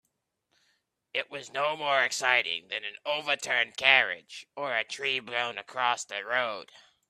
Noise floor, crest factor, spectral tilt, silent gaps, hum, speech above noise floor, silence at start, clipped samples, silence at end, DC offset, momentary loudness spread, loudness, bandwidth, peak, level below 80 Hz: -79 dBFS; 26 dB; -0.5 dB/octave; none; none; 50 dB; 1.15 s; under 0.1%; 0.45 s; under 0.1%; 12 LU; -28 LUFS; 14 kHz; -4 dBFS; -82 dBFS